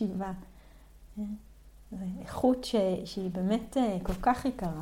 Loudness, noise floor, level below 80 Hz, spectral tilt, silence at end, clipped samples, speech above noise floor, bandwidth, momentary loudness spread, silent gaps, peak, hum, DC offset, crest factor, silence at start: -32 LUFS; -54 dBFS; -48 dBFS; -6.5 dB/octave; 0 s; under 0.1%; 23 dB; 16.5 kHz; 13 LU; none; -14 dBFS; none; under 0.1%; 18 dB; 0 s